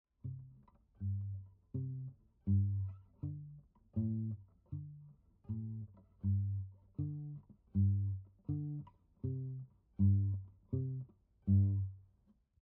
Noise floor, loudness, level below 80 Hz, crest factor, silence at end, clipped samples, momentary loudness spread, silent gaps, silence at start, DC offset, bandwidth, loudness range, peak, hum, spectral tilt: -72 dBFS; -40 LUFS; -64 dBFS; 18 dB; 0.6 s; under 0.1%; 18 LU; none; 0.25 s; under 0.1%; 1.1 kHz; 6 LU; -22 dBFS; none; -17.5 dB/octave